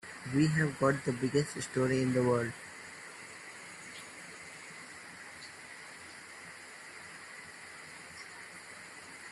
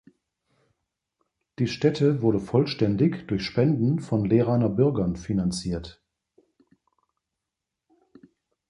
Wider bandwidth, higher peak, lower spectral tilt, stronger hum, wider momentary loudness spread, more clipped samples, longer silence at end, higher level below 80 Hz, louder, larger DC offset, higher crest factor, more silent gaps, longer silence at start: first, 12.5 kHz vs 11 kHz; second, -14 dBFS vs -8 dBFS; second, -5.5 dB/octave vs -7.5 dB/octave; neither; first, 18 LU vs 8 LU; neither; second, 0 s vs 2.75 s; second, -70 dBFS vs -50 dBFS; second, -33 LUFS vs -24 LUFS; neither; about the same, 22 dB vs 18 dB; neither; second, 0.05 s vs 1.6 s